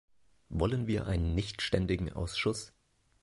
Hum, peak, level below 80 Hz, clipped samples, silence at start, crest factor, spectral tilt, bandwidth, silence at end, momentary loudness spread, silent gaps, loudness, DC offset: none; -12 dBFS; -42 dBFS; under 0.1%; 0.5 s; 20 dB; -5.5 dB/octave; 11.5 kHz; 0.55 s; 8 LU; none; -33 LUFS; under 0.1%